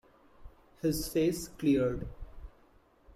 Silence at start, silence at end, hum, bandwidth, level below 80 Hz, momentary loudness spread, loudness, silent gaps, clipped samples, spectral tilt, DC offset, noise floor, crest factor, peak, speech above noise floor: 0.4 s; 0.65 s; none; 16 kHz; -50 dBFS; 19 LU; -31 LUFS; none; under 0.1%; -6 dB/octave; under 0.1%; -63 dBFS; 16 dB; -18 dBFS; 33 dB